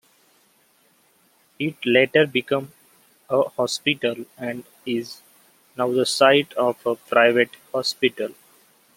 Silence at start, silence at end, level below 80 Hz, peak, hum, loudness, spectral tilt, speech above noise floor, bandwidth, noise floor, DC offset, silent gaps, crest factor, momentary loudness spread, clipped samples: 1.6 s; 0.65 s; -72 dBFS; -2 dBFS; none; -21 LUFS; -4 dB/octave; 39 dB; 16.5 kHz; -61 dBFS; under 0.1%; none; 22 dB; 15 LU; under 0.1%